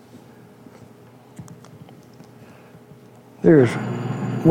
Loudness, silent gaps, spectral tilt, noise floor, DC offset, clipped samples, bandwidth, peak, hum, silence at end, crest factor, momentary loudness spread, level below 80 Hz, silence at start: -19 LUFS; none; -8.5 dB/octave; -47 dBFS; under 0.1%; under 0.1%; 13 kHz; -2 dBFS; none; 0 s; 22 dB; 28 LU; -60 dBFS; 0.15 s